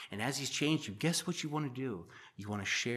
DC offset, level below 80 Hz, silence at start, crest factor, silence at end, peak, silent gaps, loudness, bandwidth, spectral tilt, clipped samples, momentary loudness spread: under 0.1%; -78 dBFS; 0 s; 18 dB; 0 s; -20 dBFS; none; -36 LUFS; 15 kHz; -4 dB/octave; under 0.1%; 11 LU